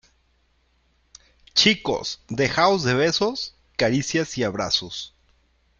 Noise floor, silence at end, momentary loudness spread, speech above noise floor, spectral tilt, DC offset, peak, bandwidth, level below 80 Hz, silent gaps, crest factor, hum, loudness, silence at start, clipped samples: -65 dBFS; 0.7 s; 12 LU; 43 dB; -3.5 dB/octave; under 0.1%; -2 dBFS; 8.6 kHz; -54 dBFS; none; 22 dB; none; -22 LUFS; 1.55 s; under 0.1%